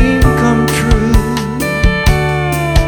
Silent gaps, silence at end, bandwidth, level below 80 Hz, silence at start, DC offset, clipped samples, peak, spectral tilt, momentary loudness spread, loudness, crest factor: none; 0 s; over 20 kHz; -16 dBFS; 0 s; under 0.1%; under 0.1%; 0 dBFS; -6 dB/octave; 5 LU; -13 LUFS; 10 dB